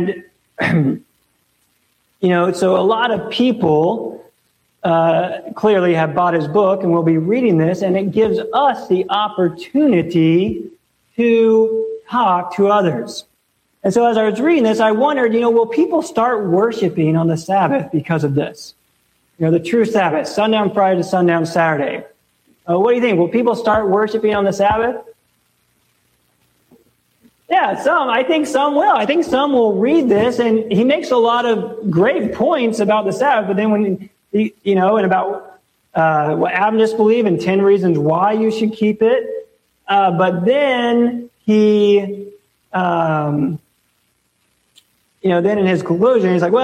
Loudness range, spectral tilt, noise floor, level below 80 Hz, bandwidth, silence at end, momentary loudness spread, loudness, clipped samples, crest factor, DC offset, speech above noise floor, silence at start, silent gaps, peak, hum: 4 LU; -6.5 dB/octave; -64 dBFS; -54 dBFS; 12.5 kHz; 0 s; 7 LU; -15 LUFS; under 0.1%; 12 dB; under 0.1%; 49 dB; 0 s; none; -4 dBFS; none